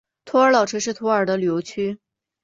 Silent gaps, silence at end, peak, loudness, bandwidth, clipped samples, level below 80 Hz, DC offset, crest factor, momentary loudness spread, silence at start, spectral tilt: none; 0.45 s; -4 dBFS; -20 LUFS; 7.8 kHz; under 0.1%; -66 dBFS; under 0.1%; 16 dB; 11 LU; 0.25 s; -4.5 dB/octave